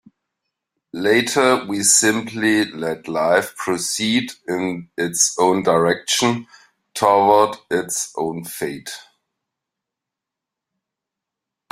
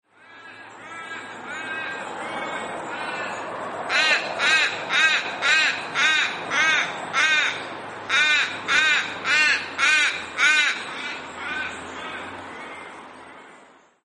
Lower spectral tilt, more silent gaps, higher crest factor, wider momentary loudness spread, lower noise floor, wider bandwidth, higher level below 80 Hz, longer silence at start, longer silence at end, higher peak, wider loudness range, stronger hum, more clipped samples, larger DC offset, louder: first, -2.5 dB/octave vs -0.5 dB/octave; neither; about the same, 20 dB vs 18 dB; second, 13 LU vs 18 LU; first, -85 dBFS vs -52 dBFS; first, 16 kHz vs 11 kHz; first, -62 dBFS vs -68 dBFS; first, 0.95 s vs 0.3 s; first, 2.7 s vs 0.45 s; first, 0 dBFS vs -6 dBFS; about the same, 11 LU vs 12 LU; neither; neither; neither; first, -18 LUFS vs -21 LUFS